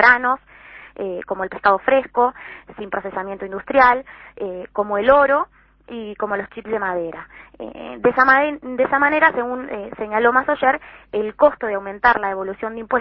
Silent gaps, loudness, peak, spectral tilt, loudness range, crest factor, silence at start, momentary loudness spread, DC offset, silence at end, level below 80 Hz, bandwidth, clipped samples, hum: none; -19 LUFS; 0 dBFS; -7 dB/octave; 4 LU; 20 dB; 0 s; 18 LU; under 0.1%; 0 s; -52 dBFS; 6 kHz; under 0.1%; none